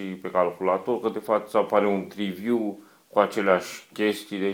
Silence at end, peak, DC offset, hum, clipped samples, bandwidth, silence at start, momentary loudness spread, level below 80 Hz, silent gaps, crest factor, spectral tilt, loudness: 0 s; -4 dBFS; under 0.1%; none; under 0.1%; 19.5 kHz; 0 s; 7 LU; -72 dBFS; none; 20 dB; -5.5 dB/octave; -25 LUFS